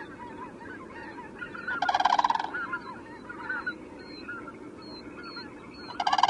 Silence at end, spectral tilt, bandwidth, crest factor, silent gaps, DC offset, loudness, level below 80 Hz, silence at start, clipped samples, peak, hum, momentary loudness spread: 0 s; -3 dB/octave; 11 kHz; 26 dB; none; under 0.1%; -33 LUFS; -64 dBFS; 0 s; under 0.1%; -6 dBFS; none; 18 LU